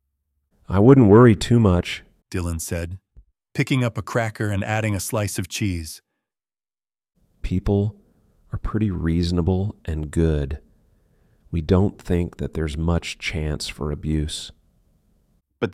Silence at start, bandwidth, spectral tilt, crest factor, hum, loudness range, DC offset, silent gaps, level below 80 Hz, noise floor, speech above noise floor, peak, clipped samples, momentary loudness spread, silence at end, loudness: 0.7 s; 15 kHz; -6.5 dB/octave; 20 dB; none; 9 LU; under 0.1%; none; -36 dBFS; under -90 dBFS; over 70 dB; -2 dBFS; under 0.1%; 17 LU; 0 s; -21 LUFS